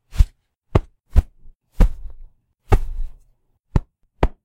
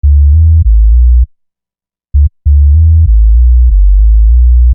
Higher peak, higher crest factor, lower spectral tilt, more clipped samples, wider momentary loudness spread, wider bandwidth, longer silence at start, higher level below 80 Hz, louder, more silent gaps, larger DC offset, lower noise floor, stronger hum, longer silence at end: about the same, 0 dBFS vs 0 dBFS; first, 20 dB vs 4 dB; second, -8 dB/octave vs -16.5 dB/octave; neither; first, 16 LU vs 5 LU; first, 9 kHz vs 0.3 kHz; about the same, 0.15 s vs 0.05 s; second, -22 dBFS vs -6 dBFS; second, -24 LUFS vs -8 LUFS; first, 1.55-1.60 s vs none; neither; second, -60 dBFS vs -88 dBFS; neither; first, 0.15 s vs 0 s